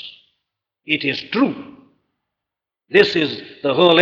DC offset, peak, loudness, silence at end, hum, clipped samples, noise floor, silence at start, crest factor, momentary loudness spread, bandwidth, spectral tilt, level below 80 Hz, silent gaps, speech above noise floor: under 0.1%; -2 dBFS; -18 LUFS; 0 s; none; under 0.1%; -85 dBFS; 0.05 s; 18 dB; 10 LU; 7.6 kHz; -6 dB/octave; -64 dBFS; none; 68 dB